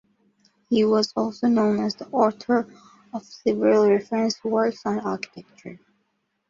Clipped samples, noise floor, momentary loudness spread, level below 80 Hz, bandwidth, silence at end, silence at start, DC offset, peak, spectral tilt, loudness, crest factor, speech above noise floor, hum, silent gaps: under 0.1%; -73 dBFS; 18 LU; -66 dBFS; 7.6 kHz; 0.75 s; 0.7 s; under 0.1%; -6 dBFS; -5.5 dB/octave; -22 LUFS; 18 dB; 51 dB; none; none